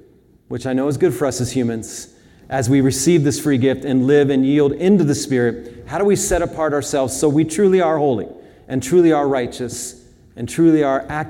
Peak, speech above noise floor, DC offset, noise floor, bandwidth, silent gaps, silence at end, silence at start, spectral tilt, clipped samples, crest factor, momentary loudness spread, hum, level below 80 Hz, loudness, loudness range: -2 dBFS; 34 dB; under 0.1%; -50 dBFS; 17.5 kHz; none; 0 s; 0.5 s; -5.5 dB/octave; under 0.1%; 14 dB; 13 LU; none; -44 dBFS; -17 LUFS; 2 LU